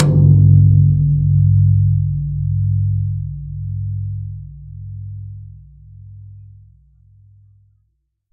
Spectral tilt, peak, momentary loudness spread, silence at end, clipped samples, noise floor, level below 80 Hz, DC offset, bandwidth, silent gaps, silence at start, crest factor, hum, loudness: -13 dB/octave; 0 dBFS; 22 LU; 1.9 s; under 0.1%; -67 dBFS; -32 dBFS; under 0.1%; 1.6 kHz; none; 0 s; 16 dB; none; -15 LUFS